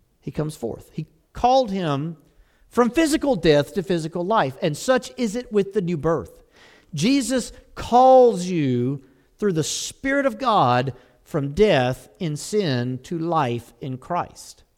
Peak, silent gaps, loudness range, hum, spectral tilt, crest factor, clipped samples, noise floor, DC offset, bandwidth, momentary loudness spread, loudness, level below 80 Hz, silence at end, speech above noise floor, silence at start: -4 dBFS; none; 4 LU; none; -5.5 dB/octave; 18 dB; under 0.1%; -52 dBFS; under 0.1%; 16 kHz; 15 LU; -21 LUFS; -48 dBFS; 0.25 s; 31 dB; 0.25 s